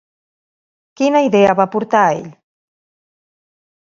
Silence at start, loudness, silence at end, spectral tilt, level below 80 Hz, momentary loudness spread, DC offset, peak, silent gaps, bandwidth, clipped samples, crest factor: 1 s; -14 LUFS; 1.55 s; -6 dB/octave; -60 dBFS; 6 LU; under 0.1%; 0 dBFS; none; 7.4 kHz; under 0.1%; 18 dB